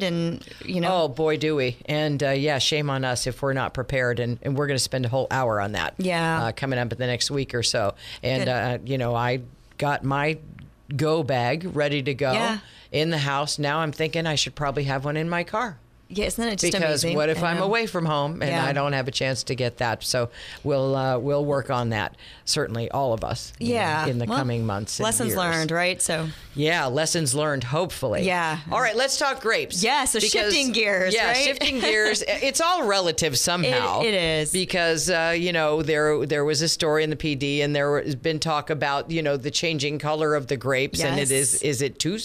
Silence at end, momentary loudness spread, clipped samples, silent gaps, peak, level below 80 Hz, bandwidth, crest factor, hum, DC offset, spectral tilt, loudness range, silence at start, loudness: 0 s; 6 LU; under 0.1%; none; -8 dBFS; -50 dBFS; 15.5 kHz; 16 dB; none; under 0.1%; -3.5 dB/octave; 5 LU; 0 s; -23 LUFS